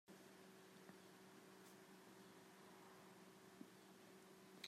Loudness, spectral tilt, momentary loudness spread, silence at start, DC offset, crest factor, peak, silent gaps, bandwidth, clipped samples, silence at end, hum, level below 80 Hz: -64 LUFS; -3.5 dB/octave; 1 LU; 0.05 s; under 0.1%; 28 dB; -36 dBFS; none; 15.5 kHz; under 0.1%; 0 s; none; under -90 dBFS